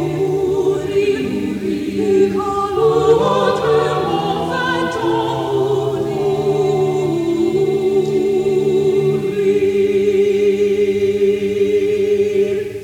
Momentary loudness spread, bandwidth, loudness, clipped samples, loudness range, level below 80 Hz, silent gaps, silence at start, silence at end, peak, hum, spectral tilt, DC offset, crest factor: 4 LU; 13.5 kHz; -16 LUFS; under 0.1%; 2 LU; -48 dBFS; none; 0 s; 0 s; -2 dBFS; none; -6.5 dB/octave; under 0.1%; 14 dB